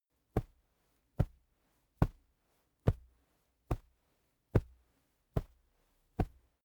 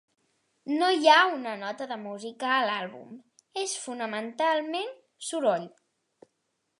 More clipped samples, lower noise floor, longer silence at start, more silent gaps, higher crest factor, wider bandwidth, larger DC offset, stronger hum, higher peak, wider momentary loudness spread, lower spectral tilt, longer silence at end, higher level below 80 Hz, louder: neither; about the same, -77 dBFS vs -78 dBFS; second, 0.35 s vs 0.65 s; neither; about the same, 28 dB vs 24 dB; first, over 20 kHz vs 11.5 kHz; neither; neither; second, -12 dBFS vs -6 dBFS; second, 7 LU vs 19 LU; first, -9 dB/octave vs -2.5 dB/octave; second, 0.35 s vs 1.1 s; first, -46 dBFS vs -88 dBFS; second, -39 LUFS vs -27 LUFS